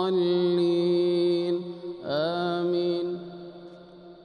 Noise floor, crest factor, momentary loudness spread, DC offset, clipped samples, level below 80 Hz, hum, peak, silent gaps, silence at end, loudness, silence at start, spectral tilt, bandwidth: -47 dBFS; 10 dB; 18 LU; under 0.1%; under 0.1%; -72 dBFS; none; -16 dBFS; none; 0 s; -26 LUFS; 0 s; -8 dB/octave; 9.4 kHz